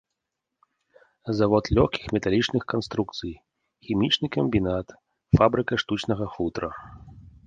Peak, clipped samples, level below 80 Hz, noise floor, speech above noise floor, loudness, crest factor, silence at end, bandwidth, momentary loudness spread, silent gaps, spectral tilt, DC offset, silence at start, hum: -4 dBFS; under 0.1%; -42 dBFS; -84 dBFS; 59 dB; -25 LUFS; 22 dB; 0.15 s; 9.2 kHz; 14 LU; none; -6.5 dB/octave; under 0.1%; 1.25 s; none